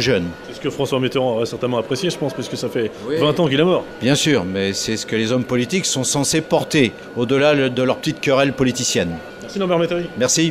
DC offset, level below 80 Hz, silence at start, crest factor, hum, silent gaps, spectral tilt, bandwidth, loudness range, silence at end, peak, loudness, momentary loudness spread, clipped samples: under 0.1%; -50 dBFS; 0 s; 18 dB; none; none; -4 dB/octave; 16 kHz; 2 LU; 0 s; -2 dBFS; -19 LUFS; 8 LU; under 0.1%